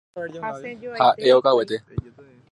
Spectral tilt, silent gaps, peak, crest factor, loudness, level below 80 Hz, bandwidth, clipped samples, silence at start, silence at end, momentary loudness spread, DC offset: -6 dB/octave; none; -4 dBFS; 18 dB; -20 LUFS; -50 dBFS; 11.5 kHz; under 0.1%; 0.15 s; 0.5 s; 18 LU; under 0.1%